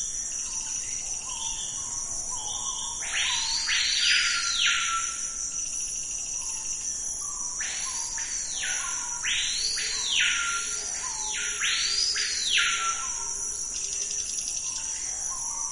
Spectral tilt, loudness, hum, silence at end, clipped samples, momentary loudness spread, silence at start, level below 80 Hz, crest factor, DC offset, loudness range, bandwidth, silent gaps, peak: 2.5 dB/octave; -26 LUFS; none; 0 s; under 0.1%; 7 LU; 0 s; -52 dBFS; 20 dB; under 0.1%; 5 LU; 11 kHz; none; -10 dBFS